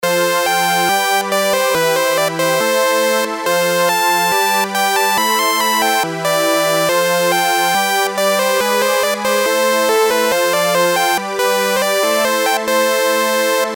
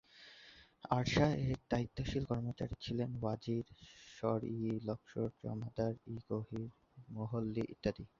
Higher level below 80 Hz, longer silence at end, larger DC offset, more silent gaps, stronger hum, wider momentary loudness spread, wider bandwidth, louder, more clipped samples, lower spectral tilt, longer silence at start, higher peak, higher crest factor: about the same, -62 dBFS vs -58 dBFS; second, 0 s vs 0.15 s; neither; neither; neither; second, 2 LU vs 19 LU; first, 19 kHz vs 7.4 kHz; first, -14 LUFS vs -39 LUFS; neither; second, -2 dB/octave vs -6.5 dB/octave; second, 0 s vs 0.15 s; first, -2 dBFS vs -18 dBFS; second, 12 dB vs 22 dB